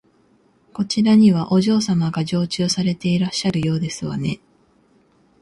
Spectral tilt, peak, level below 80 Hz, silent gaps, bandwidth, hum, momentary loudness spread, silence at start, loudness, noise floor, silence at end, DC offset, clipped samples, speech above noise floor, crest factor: -6 dB/octave; -4 dBFS; -54 dBFS; none; 11.5 kHz; none; 12 LU; 0.75 s; -19 LUFS; -58 dBFS; 1.05 s; under 0.1%; under 0.1%; 40 dB; 16 dB